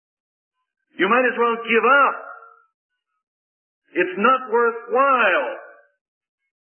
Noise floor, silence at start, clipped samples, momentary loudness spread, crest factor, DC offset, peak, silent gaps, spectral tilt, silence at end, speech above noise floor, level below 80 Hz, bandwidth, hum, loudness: under -90 dBFS; 1 s; under 0.1%; 14 LU; 18 dB; under 0.1%; -4 dBFS; 2.74-2.90 s, 3.23-3.82 s; -9 dB/octave; 1 s; over 72 dB; -86 dBFS; 3.3 kHz; none; -18 LUFS